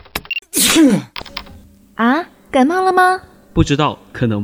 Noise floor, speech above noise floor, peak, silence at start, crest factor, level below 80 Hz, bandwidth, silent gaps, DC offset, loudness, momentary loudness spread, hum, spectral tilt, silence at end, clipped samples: -42 dBFS; 28 dB; 0 dBFS; 0.15 s; 16 dB; -36 dBFS; over 20 kHz; none; under 0.1%; -15 LUFS; 16 LU; none; -4 dB/octave; 0 s; under 0.1%